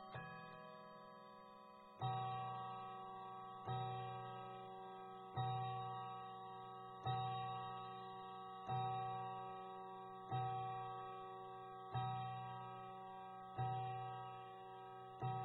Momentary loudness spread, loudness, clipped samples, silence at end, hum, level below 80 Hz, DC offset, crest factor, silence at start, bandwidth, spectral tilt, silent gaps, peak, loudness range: 11 LU; -49 LUFS; under 0.1%; 0 s; none; -80 dBFS; under 0.1%; 16 dB; 0 s; 4.6 kHz; -5 dB/octave; none; -32 dBFS; 2 LU